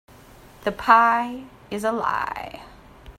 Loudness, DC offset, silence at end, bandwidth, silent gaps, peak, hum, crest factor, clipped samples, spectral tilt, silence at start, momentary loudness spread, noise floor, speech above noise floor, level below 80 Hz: -21 LUFS; under 0.1%; 0.05 s; 16 kHz; none; 0 dBFS; none; 24 dB; under 0.1%; -4.5 dB/octave; 0.6 s; 21 LU; -48 dBFS; 26 dB; -52 dBFS